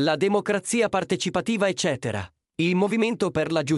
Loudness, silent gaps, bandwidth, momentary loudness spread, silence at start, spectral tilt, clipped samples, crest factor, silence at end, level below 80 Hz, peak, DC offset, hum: -24 LUFS; none; 12 kHz; 6 LU; 0 s; -5 dB/octave; under 0.1%; 14 dB; 0 s; -58 dBFS; -8 dBFS; under 0.1%; none